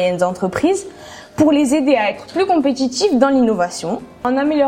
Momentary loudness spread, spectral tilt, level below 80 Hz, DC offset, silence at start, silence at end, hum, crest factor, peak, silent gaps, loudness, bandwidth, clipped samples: 10 LU; -5 dB/octave; -50 dBFS; under 0.1%; 0 s; 0 s; none; 16 dB; 0 dBFS; none; -16 LUFS; 14 kHz; under 0.1%